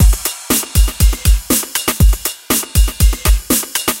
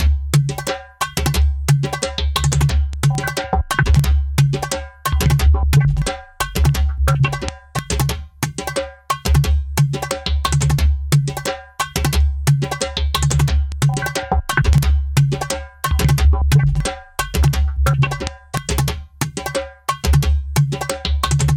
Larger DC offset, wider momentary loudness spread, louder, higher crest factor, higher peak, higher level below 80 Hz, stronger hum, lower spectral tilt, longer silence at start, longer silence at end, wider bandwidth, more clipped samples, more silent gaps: neither; second, 3 LU vs 9 LU; first, -15 LUFS vs -18 LUFS; about the same, 12 dB vs 16 dB; about the same, 0 dBFS vs -2 dBFS; first, -14 dBFS vs -22 dBFS; neither; second, -3.5 dB/octave vs -5 dB/octave; about the same, 0 s vs 0 s; about the same, 0 s vs 0 s; about the same, 17.5 kHz vs 17 kHz; neither; neither